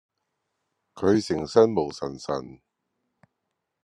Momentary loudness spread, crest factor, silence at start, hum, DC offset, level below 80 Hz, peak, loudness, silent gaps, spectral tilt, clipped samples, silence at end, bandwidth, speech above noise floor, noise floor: 12 LU; 24 dB; 0.95 s; none; under 0.1%; -62 dBFS; -4 dBFS; -24 LUFS; none; -6 dB/octave; under 0.1%; 1.3 s; 10.5 kHz; 57 dB; -81 dBFS